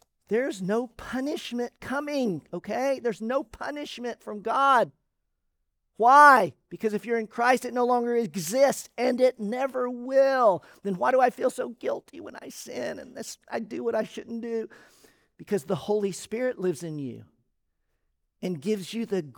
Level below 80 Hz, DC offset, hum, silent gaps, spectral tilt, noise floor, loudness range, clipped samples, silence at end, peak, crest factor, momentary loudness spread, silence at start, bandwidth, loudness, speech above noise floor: -66 dBFS; under 0.1%; none; none; -4.5 dB/octave; -77 dBFS; 11 LU; under 0.1%; 0.05 s; -4 dBFS; 22 dB; 14 LU; 0.3 s; over 20 kHz; -26 LUFS; 51 dB